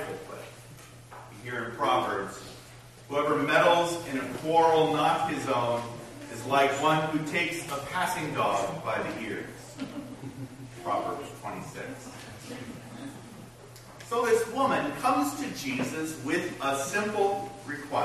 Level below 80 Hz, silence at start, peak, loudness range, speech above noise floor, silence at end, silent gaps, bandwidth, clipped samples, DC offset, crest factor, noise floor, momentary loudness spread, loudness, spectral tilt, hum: -62 dBFS; 0 s; -10 dBFS; 11 LU; 21 dB; 0 s; none; 13.5 kHz; under 0.1%; under 0.1%; 20 dB; -49 dBFS; 20 LU; -28 LUFS; -4.5 dB/octave; none